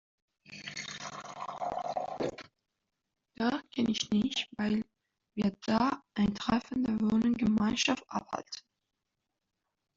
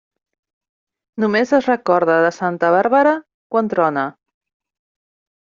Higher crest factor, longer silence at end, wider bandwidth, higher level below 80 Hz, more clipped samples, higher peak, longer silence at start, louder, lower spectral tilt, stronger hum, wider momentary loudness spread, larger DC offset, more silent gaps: about the same, 18 dB vs 16 dB; about the same, 1.4 s vs 1.45 s; about the same, 7.6 kHz vs 7.4 kHz; about the same, -62 dBFS vs -66 dBFS; neither; second, -14 dBFS vs -2 dBFS; second, 0.5 s vs 1.15 s; second, -32 LUFS vs -17 LUFS; about the same, -4.5 dB/octave vs -4.5 dB/octave; neither; first, 14 LU vs 9 LU; neither; second, none vs 3.34-3.50 s